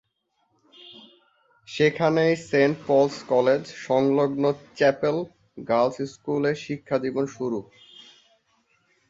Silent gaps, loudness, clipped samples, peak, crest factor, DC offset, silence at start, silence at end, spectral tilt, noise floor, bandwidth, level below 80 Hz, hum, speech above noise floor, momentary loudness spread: none; -24 LUFS; under 0.1%; -6 dBFS; 20 dB; under 0.1%; 0.85 s; 1.5 s; -6 dB/octave; -72 dBFS; 8 kHz; -66 dBFS; none; 49 dB; 10 LU